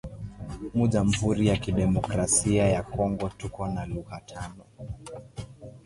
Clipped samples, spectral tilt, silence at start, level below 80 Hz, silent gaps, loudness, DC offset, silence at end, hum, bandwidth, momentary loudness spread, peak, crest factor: under 0.1%; -5.5 dB/octave; 0.05 s; -42 dBFS; none; -26 LUFS; under 0.1%; 0.05 s; none; 11.5 kHz; 18 LU; -10 dBFS; 18 dB